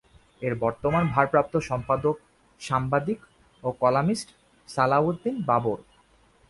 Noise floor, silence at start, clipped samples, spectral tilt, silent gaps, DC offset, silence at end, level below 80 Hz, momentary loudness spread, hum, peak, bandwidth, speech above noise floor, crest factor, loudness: -60 dBFS; 0.4 s; under 0.1%; -7 dB/octave; none; under 0.1%; 0.7 s; -54 dBFS; 12 LU; none; -4 dBFS; 11.5 kHz; 35 dB; 22 dB; -26 LUFS